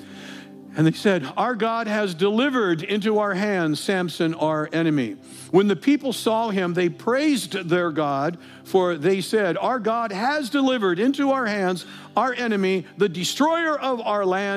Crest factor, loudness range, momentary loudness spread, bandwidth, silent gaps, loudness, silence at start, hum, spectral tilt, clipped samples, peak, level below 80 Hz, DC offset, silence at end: 16 dB; 1 LU; 4 LU; 15.5 kHz; none; -22 LUFS; 0 s; none; -5.5 dB/octave; under 0.1%; -6 dBFS; -80 dBFS; under 0.1%; 0 s